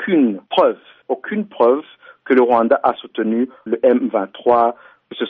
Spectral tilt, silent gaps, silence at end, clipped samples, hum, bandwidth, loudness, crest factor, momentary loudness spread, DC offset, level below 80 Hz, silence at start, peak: -4 dB/octave; none; 0 s; under 0.1%; none; 4.8 kHz; -17 LUFS; 14 dB; 10 LU; under 0.1%; -64 dBFS; 0 s; -2 dBFS